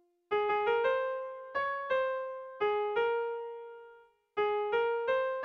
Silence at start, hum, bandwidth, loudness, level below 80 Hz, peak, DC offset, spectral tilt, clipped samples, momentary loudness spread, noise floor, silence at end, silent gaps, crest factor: 0.3 s; none; 6 kHz; -32 LUFS; -72 dBFS; -18 dBFS; under 0.1%; -4.5 dB/octave; under 0.1%; 11 LU; -59 dBFS; 0 s; none; 14 dB